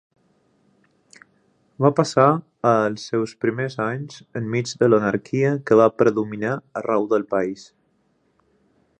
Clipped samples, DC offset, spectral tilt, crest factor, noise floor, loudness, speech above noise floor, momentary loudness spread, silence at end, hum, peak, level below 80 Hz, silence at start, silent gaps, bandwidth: under 0.1%; under 0.1%; -6.5 dB/octave; 20 dB; -65 dBFS; -21 LUFS; 45 dB; 10 LU; 1.35 s; none; -2 dBFS; -64 dBFS; 1.8 s; none; 9.8 kHz